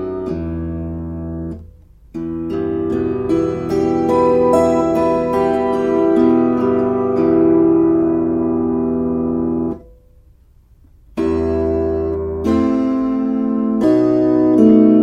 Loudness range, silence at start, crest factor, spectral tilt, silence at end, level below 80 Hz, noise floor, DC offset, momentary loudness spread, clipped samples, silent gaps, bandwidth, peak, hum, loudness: 7 LU; 0 s; 16 dB; -9 dB/octave; 0 s; -38 dBFS; -48 dBFS; under 0.1%; 12 LU; under 0.1%; none; 9.2 kHz; 0 dBFS; none; -16 LUFS